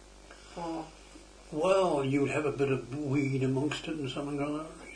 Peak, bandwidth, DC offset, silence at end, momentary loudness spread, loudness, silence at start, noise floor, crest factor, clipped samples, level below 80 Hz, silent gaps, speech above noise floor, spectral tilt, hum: -14 dBFS; 10.5 kHz; under 0.1%; 0 s; 14 LU; -31 LUFS; 0 s; -52 dBFS; 18 dB; under 0.1%; -56 dBFS; none; 22 dB; -6.5 dB/octave; none